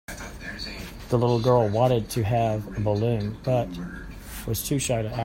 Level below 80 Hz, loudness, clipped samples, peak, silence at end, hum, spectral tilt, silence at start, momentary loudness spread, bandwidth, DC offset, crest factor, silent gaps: -44 dBFS; -25 LUFS; under 0.1%; -6 dBFS; 0 s; none; -6 dB/octave; 0.1 s; 16 LU; 16.5 kHz; under 0.1%; 18 dB; none